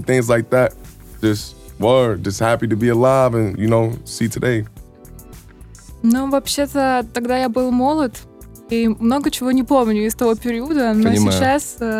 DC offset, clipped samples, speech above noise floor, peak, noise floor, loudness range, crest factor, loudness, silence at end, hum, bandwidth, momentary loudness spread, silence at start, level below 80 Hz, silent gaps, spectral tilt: under 0.1%; under 0.1%; 24 dB; -4 dBFS; -40 dBFS; 4 LU; 14 dB; -17 LUFS; 0 s; none; 16 kHz; 7 LU; 0 s; -42 dBFS; none; -5.5 dB/octave